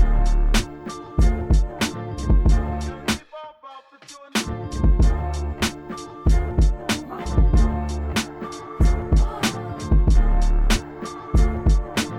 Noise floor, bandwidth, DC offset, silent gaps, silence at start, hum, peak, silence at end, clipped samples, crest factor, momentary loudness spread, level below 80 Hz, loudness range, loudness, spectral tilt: -45 dBFS; 14 kHz; under 0.1%; none; 0 s; none; -6 dBFS; 0 s; under 0.1%; 14 dB; 14 LU; -20 dBFS; 3 LU; -23 LUFS; -5.5 dB/octave